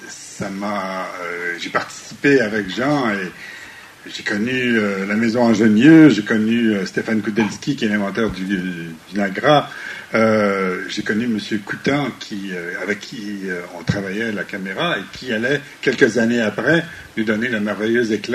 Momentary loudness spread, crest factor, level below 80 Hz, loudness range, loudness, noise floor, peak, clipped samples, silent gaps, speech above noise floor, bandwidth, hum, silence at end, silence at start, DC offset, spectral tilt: 12 LU; 18 dB; -54 dBFS; 8 LU; -19 LUFS; -39 dBFS; 0 dBFS; under 0.1%; none; 20 dB; 14 kHz; none; 0 s; 0 s; under 0.1%; -5.5 dB/octave